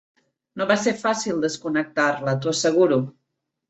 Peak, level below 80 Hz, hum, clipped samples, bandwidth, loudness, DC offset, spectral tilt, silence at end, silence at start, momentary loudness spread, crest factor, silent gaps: -4 dBFS; -66 dBFS; none; under 0.1%; 8.2 kHz; -22 LUFS; under 0.1%; -4.5 dB/octave; 0.6 s; 0.55 s; 7 LU; 18 dB; none